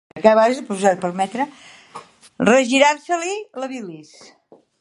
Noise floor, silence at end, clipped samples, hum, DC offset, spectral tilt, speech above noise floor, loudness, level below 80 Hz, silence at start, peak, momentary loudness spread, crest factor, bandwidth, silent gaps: -41 dBFS; 0.8 s; under 0.1%; none; under 0.1%; -4 dB/octave; 23 dB; -18 LUFS; -66 dBFS; 0.15 s; 0 dBFS; 20 LU; 20 dB; 11.5 kHz; none